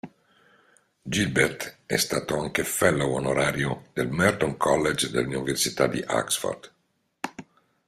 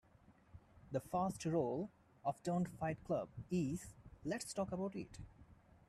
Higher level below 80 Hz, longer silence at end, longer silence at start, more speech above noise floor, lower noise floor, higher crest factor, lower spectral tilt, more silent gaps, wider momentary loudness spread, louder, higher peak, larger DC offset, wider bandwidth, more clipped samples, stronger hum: first, -54 dBFS vs -66 dBFS; about the same, 0.45 s vs 0.35 s; second, 0.05 s vs 0.3 s; first, 47 dB vs 27 dB; first, -72 dBFS vs -68 dBFS; about the same, 22 dB vs 18 dB; second, -4 dB/octave vs -6.5 dB/octave; neither; about the same, 14 LU vs 13 LU; first, -25 LUFS vs -42 LUFS; first, -6 dBFS vs -26 dBFS; neither; first, 16 kHz vs 13.5 kHz; neither; neither